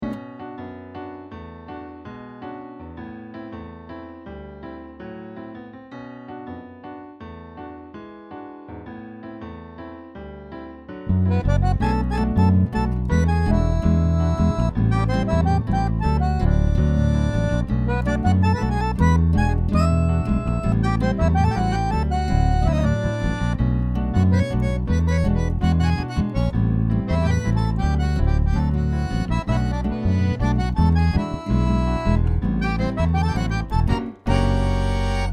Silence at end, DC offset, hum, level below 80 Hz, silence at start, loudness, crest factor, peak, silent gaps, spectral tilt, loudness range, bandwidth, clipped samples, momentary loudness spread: 0 s; under 0.1%; none; -26 dBFS; 0 s; -21 LUFS; 16 dB; -4 dBFS; none; -8 dB/octave; 17 LU; 9.4 kHz; under 0.1%; 18 LU